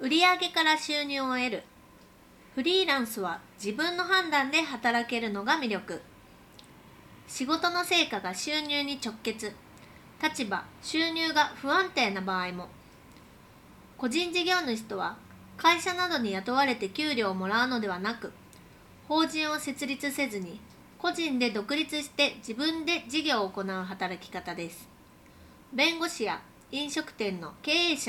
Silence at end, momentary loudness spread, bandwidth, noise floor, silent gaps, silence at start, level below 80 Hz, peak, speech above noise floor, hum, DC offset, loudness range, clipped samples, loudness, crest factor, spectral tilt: 0 s; 13 LU; 18.5 kHz; -55 dBFS; none; 0 s; -66 dBFS; -10 dBFS; 26 dB; none; under 0.1%; 4 LU; under 0.1%; -29 LUFS; 20 dB; -3 dB/octave